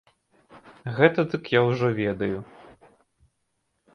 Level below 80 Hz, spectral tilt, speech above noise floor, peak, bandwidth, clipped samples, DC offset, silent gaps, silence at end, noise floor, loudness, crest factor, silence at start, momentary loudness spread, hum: -60 dBFS; -8 dB/octave; 52 dB; -2 dBFS; 6.6 kHz; under 0.1%; under 0.1%; none; 1.5 s; -75 dBFS; -24 LUFS; 24 dB; 0.55 s; 14 LU; none